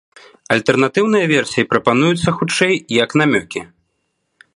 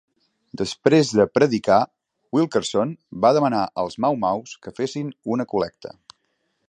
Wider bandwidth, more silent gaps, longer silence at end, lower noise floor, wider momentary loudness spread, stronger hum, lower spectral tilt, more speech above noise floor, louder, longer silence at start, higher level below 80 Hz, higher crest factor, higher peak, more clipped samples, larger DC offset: first, 11.5 kHz vs 10 kHz; neither; about the same, 0.9 s vs 0.8 s; about the same, -69 dBFS vs -72 dBFS; second, 5 LU vs 12 LU; neither; about the same, -5 dB/octave vs -5.5 dB/octave; about the same, 54 dB vs 51 dB; first, -15 LUFS vs -21 LUFS; about the same, 0.5 s vs 0.6 s; first, -52 dBFS vs -58 dBFS; about the same, 16 dB vs 20 dB; about the same, 0 dBFS vs -2 dBFS; neither; neither